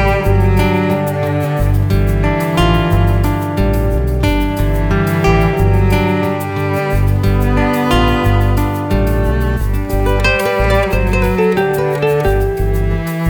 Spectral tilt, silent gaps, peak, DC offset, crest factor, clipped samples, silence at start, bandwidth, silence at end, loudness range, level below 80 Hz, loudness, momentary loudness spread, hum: -7 dB/octave; none; 0 dBFS; under 0.1%; 12 dB; under 0.1%; 0 s; over 20 kHz; 0 s; 1 LU; -18 dBFS; -14 LUFS; 4 LU; none